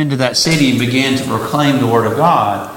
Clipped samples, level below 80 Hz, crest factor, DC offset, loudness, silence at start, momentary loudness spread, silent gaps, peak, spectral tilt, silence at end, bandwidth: under 0.1%; -48 dBFS; 14 dB; under 0.1%; -13 LUFS; 0 s; 3 LU; none; 0 dBFS; -4.5 dB/octave; 0 s; 17 kHz